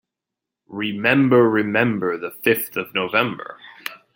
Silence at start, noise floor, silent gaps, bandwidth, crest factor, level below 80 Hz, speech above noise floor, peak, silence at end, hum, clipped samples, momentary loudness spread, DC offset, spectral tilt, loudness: 0.7 s; -85 dBFS; none; 17 kHz; 20 dB; -64 dBFS; 65 dB; -2 dBFS; 0.2 s; none; under 0.1%; 18 LU; under 0.1%; -5.5 dB/octave; -19 LUFS